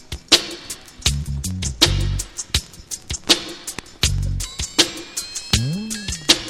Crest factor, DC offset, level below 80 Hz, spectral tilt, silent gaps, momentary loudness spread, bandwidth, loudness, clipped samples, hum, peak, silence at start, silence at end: 22 dB; under 0.1%; -32 dBFS; -2.5 dB/octave; none; 14 LU; 17 kHz; -20 LUFS; under 0.1%; none; 0 dBFS; 0 s; 0 s